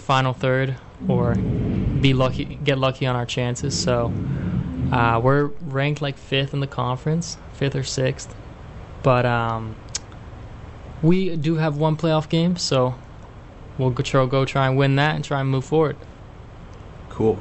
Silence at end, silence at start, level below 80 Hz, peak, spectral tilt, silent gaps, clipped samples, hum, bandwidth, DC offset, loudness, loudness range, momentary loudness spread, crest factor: 0 s; 0 s; -40 dBFS; -4 dBFS; -6 dB/octave; none; under 0.1%; none; 8.4 kHz; under 0.1%; -22 LUFS; 3 LU; 20 LU; 18 dB